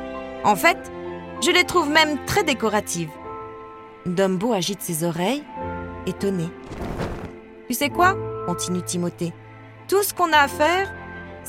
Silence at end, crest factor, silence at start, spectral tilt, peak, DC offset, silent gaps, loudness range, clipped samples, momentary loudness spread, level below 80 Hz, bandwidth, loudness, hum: 0 s; 20 dB; 0 s; -3.5 dB/octave; -4 dBFS; under 0.1%; none; 5 LU; under 0.1%; 18 LU; -48 dBFS; 17 kHz; -22 LUFS; none